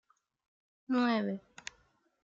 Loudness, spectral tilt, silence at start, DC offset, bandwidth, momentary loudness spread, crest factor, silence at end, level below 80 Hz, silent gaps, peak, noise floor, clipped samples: -33 LUFS; -5.5 dB/octave; 0.9 s; under 0.1%; 7.8 kHz; 18 LU; 18 dB; 0.85 s; -80 dBFS; none; -20 dBFS; -71 dBFS; under 0.1%